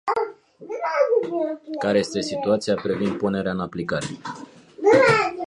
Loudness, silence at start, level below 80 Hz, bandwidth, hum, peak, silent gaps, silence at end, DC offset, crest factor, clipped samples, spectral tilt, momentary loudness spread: -22 LUFS; 0.05 s; -56 dBFS; 11.5 kHz; none; -4 dBFS; none; 0 s; under 0.1%; 18 dB; under 0.1%; -5.5 dB/octave; 15 LU